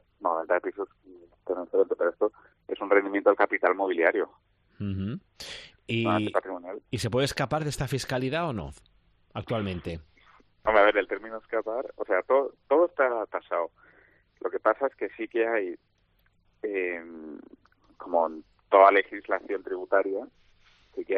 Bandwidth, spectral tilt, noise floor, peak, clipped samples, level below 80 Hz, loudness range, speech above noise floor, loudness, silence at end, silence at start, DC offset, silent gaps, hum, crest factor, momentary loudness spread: 11 kHz; -5.5 dB/octave; -68 dBFS; -4 dBFS; under 0.1%; -58 dBFS; 6 LU; 41 dB; -27 LUFS; 0 s; 0.2 s; under 0.1%; none; none; 24 dB; 17 LU